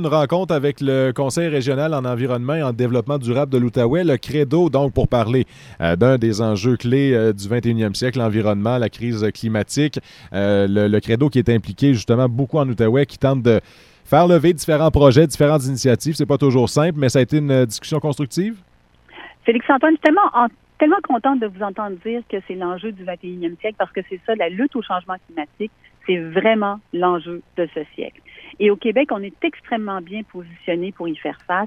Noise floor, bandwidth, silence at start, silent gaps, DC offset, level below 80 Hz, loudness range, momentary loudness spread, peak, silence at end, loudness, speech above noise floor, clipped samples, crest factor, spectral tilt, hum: -50 dBFS; 15 kHz; 0 s; none; under 0.1%; -42 dBFS; 7 LU; 12 LU; 0 dBFS; 0 s; -18 LUFS; 32 dB; under 0.1%; 18 dB; -6.5 dB/octave; none